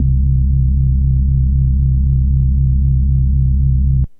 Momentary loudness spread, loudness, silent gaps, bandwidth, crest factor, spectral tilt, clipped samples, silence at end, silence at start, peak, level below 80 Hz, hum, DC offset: 0 LU; -15 LUFS; none; 0.5 kHz; 8 dB; -14.5 dB/octave; under 0.1%; 0.05 s; 0 s; -4 dBFS; -14 dBFS; none; under 0.1%